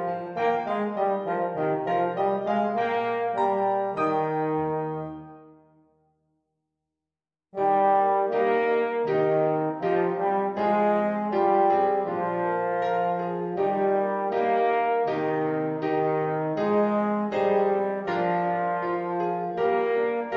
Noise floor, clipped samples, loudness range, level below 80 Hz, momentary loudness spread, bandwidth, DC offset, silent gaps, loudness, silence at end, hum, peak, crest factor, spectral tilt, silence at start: under -90 dBFS; under 0.1%; 5 LU; -70 dBFS; 5 LU; 6.8 kHz; under 0.1%; none; -25 LUFS; 0 s; none; -10 dBFS; 14 dB; -8.5 dB/octave; 0 s